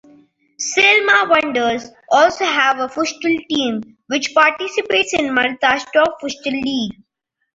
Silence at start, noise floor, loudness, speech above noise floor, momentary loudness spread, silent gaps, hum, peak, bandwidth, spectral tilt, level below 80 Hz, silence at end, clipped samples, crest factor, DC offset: 0.6 s; -51 dBFS; -16 LUFS; 34 dB; 11 LU; none; none; -2 dBFS; 8 kHz; -2 dB/octave; -56 dBFS; 0.65 s; under 0.1%; 16 dB; under 0.1%